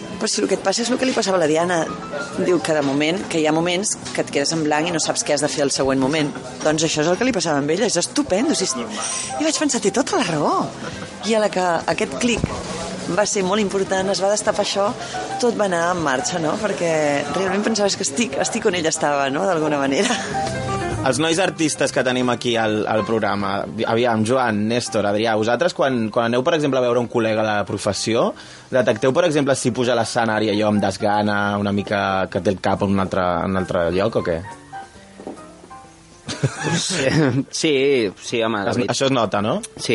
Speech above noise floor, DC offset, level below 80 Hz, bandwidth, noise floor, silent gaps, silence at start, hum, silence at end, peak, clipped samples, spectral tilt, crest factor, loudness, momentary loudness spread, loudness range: 24 dB; under 0.1%; -52 dBFS; 11.5 kHz; -44 dBFS; none; 0 s; none; 0 s; -2 dBFS; under 0.1%; -4 dB/octave; 18 dB; -20 LUFS; 5 LU; 2 LU